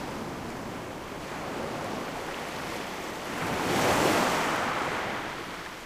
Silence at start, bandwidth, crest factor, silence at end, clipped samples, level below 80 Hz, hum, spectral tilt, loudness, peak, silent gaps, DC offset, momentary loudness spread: 0 s; 15.5 kHz; 20 dB; 0 s; under 0.1%; -54 dBFS; none; -3.5 dB/octave; -30 LUFS; -12 dBFS; none; under 0.1%; 13 LU